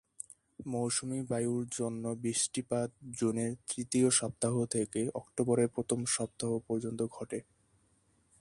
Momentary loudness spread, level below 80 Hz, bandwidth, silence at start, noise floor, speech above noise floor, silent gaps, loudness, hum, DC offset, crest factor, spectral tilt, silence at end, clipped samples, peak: 10 LU; -68 dBFS; 11.5 kHz; 0.6 s; -71 dBFS; 37 dB; none; -33 LUFS; none; under 0.1%; 20 dB; -4.5 dB/octave; 1 s; under 0.1%; -14 dBFS